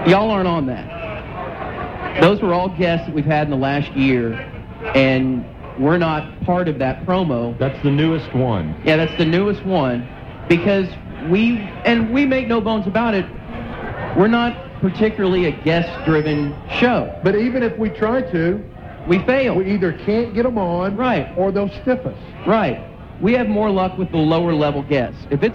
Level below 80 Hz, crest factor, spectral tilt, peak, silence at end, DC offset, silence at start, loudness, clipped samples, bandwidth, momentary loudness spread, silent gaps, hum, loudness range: -38 dBFS; 18 dB; -8.5 dB/octave; 0 dBFS; 0 s; under 0.1%; 0 s; -18 LUFS; under 0.1%; 7.4 kHz; 11 LU; none; none; 1 LU